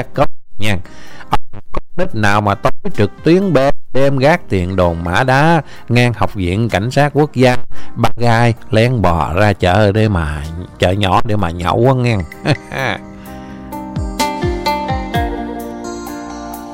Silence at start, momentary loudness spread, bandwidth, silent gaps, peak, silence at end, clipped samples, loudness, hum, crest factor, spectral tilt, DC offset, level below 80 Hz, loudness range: 0 s; 14 LU; 16.5 kHz; none; 0 dBFS; 0 s; under 0.1%; -15 LUFS; none; 12 dB; -6.5 dB/octave; under 0.1%; -30 dBFS; 6 LU